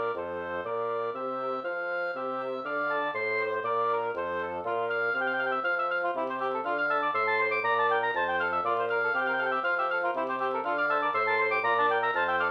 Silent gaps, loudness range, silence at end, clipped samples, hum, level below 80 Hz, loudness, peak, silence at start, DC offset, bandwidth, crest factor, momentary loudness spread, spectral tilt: none; 3 LU; 0 s; under 0.1%; none; -74 dBFS; -28 LUFS; -14 dBFS; 0 s; under 0.1%; 6.4 kHz; 14 dB; 7 LU; -6 dB/octave